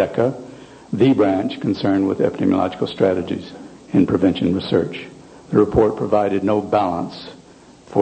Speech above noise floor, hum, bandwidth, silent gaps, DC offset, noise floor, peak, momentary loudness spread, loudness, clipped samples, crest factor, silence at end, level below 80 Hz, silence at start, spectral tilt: 27 dB; none; 9 kHz; none; under 0.1%; -45 dBFS; -2 dBFS; 17 LU; -19 LUFS; under 0.1%; 18 dB; 0 s; -46 dBFS; 0 s; -8 dB/octave